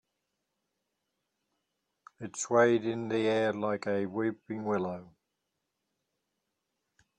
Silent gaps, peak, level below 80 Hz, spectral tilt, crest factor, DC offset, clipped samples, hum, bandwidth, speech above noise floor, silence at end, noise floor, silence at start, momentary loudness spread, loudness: none; -12 dBFS; -76 dBFS; -5 dB/octave; 22 dB; under 0.1%; under 0.1%; none; 10 kHz; 54 dB; 2.15 s; -84 dBFS; 2.2 s; 13 LU; -30 LUFS